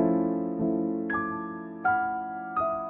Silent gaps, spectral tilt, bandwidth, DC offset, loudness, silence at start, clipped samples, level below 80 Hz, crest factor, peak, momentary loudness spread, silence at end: none; -11.5 dB/octave; 3.6 kHz; under 0.1%; -29 LUFS; 0 s; under 0.1%; -62 dBFS; 16 dB; -12 dBFS; 7 LU; 0 s